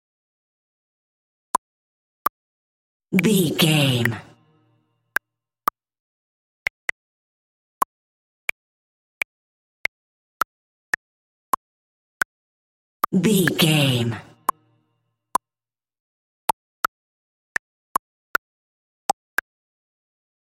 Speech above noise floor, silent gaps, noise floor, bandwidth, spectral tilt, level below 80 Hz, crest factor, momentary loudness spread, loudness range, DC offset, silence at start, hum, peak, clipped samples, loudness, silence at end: over 71 dB; 6.00-13.00 s; under -90 dBFS; 16 kHz; -4.5 dB/octave; -62 dBFS; 24 dB; 12 LU; 9 LU; under 0.1%; 3.1 s; none; -2 dBFS; under 0.1%; -24 LUFS; 6.3 s